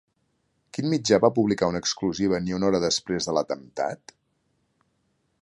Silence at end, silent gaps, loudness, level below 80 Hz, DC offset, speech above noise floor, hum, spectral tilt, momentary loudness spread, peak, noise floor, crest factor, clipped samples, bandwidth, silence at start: 1.45 s; none; -24 LUFS; -56 dBFS; under 0.1%; 48 dB; none; -4.5 dB/octave; 11 LU; -4 dBFS; -72 dBFS; 22 dB; under 0.1%; 11.5 kHz; 0.75 s